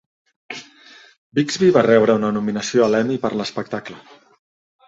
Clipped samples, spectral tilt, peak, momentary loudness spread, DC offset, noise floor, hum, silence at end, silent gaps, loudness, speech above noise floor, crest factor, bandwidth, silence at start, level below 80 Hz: under 0.1%; -5.5 dB/octave; -2 dBFS; 20 LU; under 0.1%; -47 dBFS; none; 0.9 s; 1.18-1.32 s; -18 LUFS; 29 dB; 18 dB; 8 kHz; 0.5 s; -60 dBFS